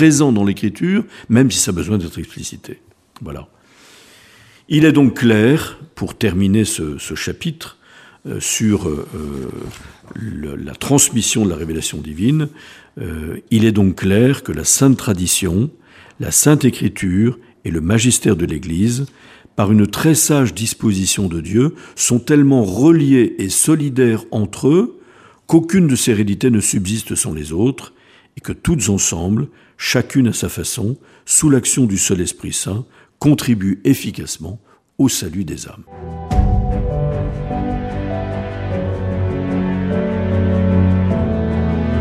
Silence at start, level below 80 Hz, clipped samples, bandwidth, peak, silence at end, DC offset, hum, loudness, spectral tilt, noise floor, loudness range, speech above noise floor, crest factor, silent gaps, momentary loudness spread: 0 s; -32 dBFS; under 0.1%; 15.5 kHz; 0 dBFS; 0 s; under 0.1%; none; -16 LUFS; -5 dB/octave; -47 dBFS; 7 LU; 31 dB; 16 dB; none; 16 LU